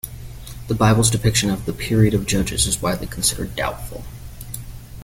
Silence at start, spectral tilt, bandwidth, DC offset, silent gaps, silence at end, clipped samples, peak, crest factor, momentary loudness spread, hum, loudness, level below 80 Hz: 0.05 s; -4.5 dB/octave; 17 kHz; under 0.1%; none; 0 s; under 0.1%; -2 dBFS; 18 dB; 20 LU; none; -19 LUFS; -34 dBFS